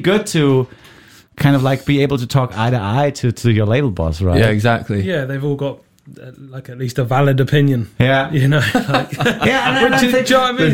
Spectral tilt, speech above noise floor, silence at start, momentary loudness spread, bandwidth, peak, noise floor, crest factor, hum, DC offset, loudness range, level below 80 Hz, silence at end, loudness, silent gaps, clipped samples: -6 dB/octave; 29 dB; 0 s; 8 LU; 17 kHz; -2 dBFS; -44 dBFS; 14 dB; none; 0.3%; 4 LU; -38 dBFS; 0 s; -15 LUFS; none; under 0.1%